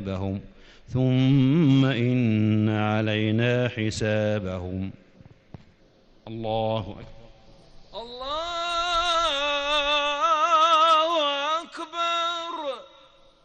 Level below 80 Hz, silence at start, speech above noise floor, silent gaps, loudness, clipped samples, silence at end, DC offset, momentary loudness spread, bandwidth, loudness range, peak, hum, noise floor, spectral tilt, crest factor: -52 dBFS; 0 s; 33 dB; none; -23 LUFS; under 0.1%; 0.6 s; under 0.1%; 15 LU; 9.4 kHz; 12 LU; -10 dBFS; none; -57 dBFS; -6 dB/octave; 14 dB